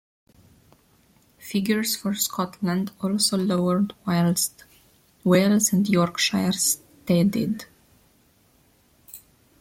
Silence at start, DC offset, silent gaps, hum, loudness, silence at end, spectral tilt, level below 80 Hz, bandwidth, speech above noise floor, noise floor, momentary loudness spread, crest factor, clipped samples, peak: 1.4 s; under 0.1%; none; none; -23 LUFS; 0.45 s; -4.5 dB/octave; -62 dBFS; 16.5 kHz; 38 dB; -60 dBFS; 9 LU; 18 dB; under 0.1%; -6 dBFS